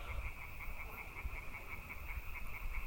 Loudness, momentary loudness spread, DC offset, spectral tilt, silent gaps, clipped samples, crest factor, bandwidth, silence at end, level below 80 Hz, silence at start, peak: -47 LUFS; 2 LU; under 0.1%; -4.5 dB/octave; none; under 0.1%; 14 dB; 17 kHz; 0 s; -46 dBFS; 0 s; -28 dBFS